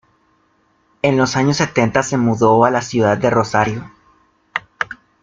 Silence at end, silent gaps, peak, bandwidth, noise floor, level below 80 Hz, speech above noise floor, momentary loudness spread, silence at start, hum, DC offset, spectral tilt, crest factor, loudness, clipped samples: 0.3 s; none; 0 dBFS; 9.4 kHz; -59 dBFS; -50 dBFS; 44 dB; 13 LU; 1.05 s; none; under 0.1%; -5.5 dB/octave; 16 dB; -16 LUFS; under 0.1%